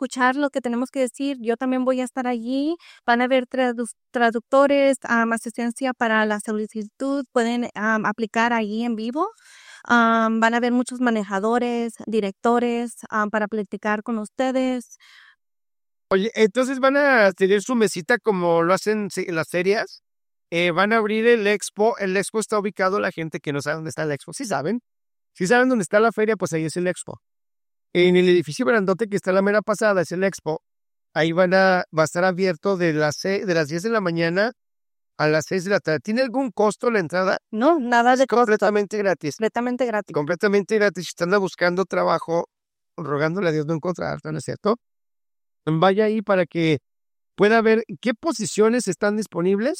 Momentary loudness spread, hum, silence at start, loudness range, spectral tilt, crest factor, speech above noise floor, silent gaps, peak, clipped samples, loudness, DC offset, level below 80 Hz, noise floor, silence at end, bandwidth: 9 LU; none; 0 s; 4 LU; -5 dB/octave; 16 dB; over 69 dB; none; -4 dBFS; under 0.1%; -21 LUFS; under 0.1%; -68 dBFS; under -90 dBFS; 0 s; 15.5 kHz